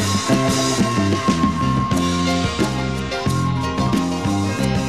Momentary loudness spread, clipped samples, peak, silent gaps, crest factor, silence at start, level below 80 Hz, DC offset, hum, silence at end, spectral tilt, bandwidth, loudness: 3 LU; under 0.1%; -4 dBFS; none; 14 dB; 0 s; -36 dBFS; 0.5%; none; 0 s; -5 dB/octave; 14 kHz; -19 LUFS